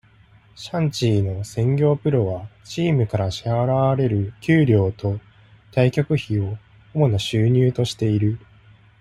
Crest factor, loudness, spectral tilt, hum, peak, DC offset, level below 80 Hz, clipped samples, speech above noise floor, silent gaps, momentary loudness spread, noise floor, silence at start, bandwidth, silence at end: 16 dB; -21 LUFS; -7 dB/octave; none; -4 dBFS; under 0.1%; -50 dBFS; under 0.1%; 32 dB; none; 11 LU; -52 dBFS; 0.6 s; 12 kHz; 0.65 s